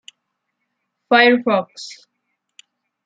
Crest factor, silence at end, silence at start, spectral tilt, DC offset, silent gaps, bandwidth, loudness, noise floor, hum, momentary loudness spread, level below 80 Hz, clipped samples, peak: 20 dB; 1.15 s; 1.1 s; -4 dB/octave; under 0.1%; none; 9.2 kHz; -15 LUFS; -75 dBFS; none; 22 LU; -74 dBFS; under 0.1%; -2 dBFS